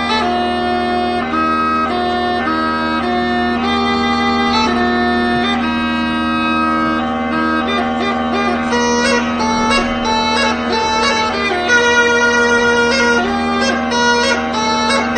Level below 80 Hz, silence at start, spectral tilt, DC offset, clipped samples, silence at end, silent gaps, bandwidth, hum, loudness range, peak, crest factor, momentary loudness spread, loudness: -38 dBFS; 0 s; -3.5 dB/octave; under 0.1%; under 0.1%; 0 s; none; 9 kHz; none; 3 LU; 0 dBFS; 14 dB; 5 LU; -14 LUFS